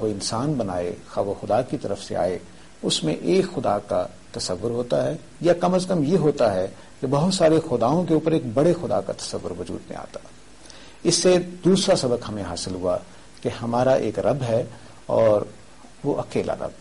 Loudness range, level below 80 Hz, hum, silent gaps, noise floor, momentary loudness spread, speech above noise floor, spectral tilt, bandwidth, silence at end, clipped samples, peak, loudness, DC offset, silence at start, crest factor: 4 LU; -52 dBFS; none; none; -46 dBFS; 12 LU; 23 dB; -5.5 dB/octave; 11.5 kHz; 0.05 s; under 0.1%; -8 dBFS; -23 LUFS; 0.5%; 0 s; 14 dB